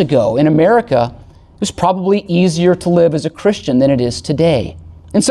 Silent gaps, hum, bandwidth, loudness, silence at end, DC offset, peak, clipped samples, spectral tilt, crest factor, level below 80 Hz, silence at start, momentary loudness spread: none; none; 12 kHz; -14 LUFS; 0 s; under 0.1%; -2 dBFS; under 0.1%; -6 dB/octave; 12 dB; -40 dBFS; 0 s; 7 LU